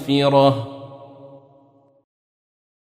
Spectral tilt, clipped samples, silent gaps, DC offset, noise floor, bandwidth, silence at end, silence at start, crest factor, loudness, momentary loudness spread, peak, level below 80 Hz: -7 dB/octave; under 0.1%; none; under 0.1%; -55 dBFS; 13.5 kHz; 1.9 s; 0 s; 20 dB; -17 LUFS; 25 LU; -4 dBFS; -62 dBFS